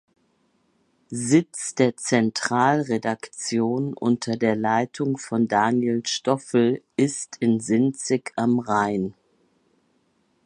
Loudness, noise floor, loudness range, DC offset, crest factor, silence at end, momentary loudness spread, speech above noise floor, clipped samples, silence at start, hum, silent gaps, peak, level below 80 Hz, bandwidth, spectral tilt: -23 LUFS; -67 dBFS; 1 LU; under 0.1%; 18 dB; 1.35 s; 6 LU; 44 dB; under 0.1%; 1.1 s; none; none; -4 dBFS; -66 dBFS; 11.5 kHz; -5 dB/octave